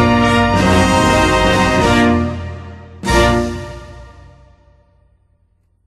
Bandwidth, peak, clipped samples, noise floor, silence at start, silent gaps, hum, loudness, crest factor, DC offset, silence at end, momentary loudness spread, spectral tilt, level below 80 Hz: 13 kHz; 0 dBFS; under 0.1%; -58 dBFS; 0 s; none; none; -13 LUFS; 14 dB; under 0.1%; 1.8 s; 18 LU; -5 dB/octave; -28 dBFS